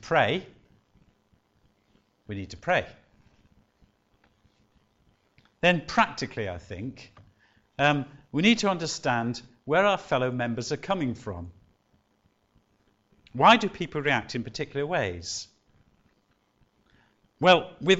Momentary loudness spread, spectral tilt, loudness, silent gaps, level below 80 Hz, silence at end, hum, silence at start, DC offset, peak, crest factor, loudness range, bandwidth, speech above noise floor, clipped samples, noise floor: 18 LU; -4.5 dB/octave; -26 LUFS; none; -58 dBFS; 0 s; none; 0.05 s; under 0.1%; -6 dBFS; 24 dB; 9 LU; 8.2 kHz; 43 dB; under 0.1%; -69 dBFS